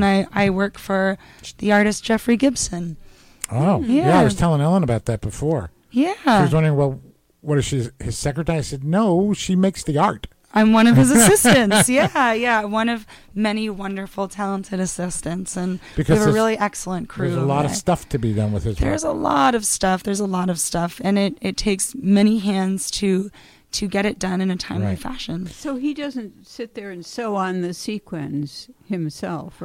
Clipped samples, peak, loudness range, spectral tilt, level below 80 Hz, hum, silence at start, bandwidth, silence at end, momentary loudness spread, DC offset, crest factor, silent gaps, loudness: under 0.1%; -2 dBFS; 10 LU; -5 dB/octave; -40 dBFS; none; 0 s; 16.5 kHz; 0 s; 13 LU; under 0.1%; 16 dB; none; -20 LUFS